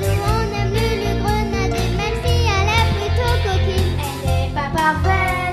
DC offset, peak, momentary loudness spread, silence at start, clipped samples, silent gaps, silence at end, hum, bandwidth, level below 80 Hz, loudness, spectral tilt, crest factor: under 0.1%; -2 dBFS; 4 LU; 0 s; under 0.1%; none; 0 s; none; 14 kHz; -26 dBFS; -19 LUFS; -5.5 dB/octave; 16 dB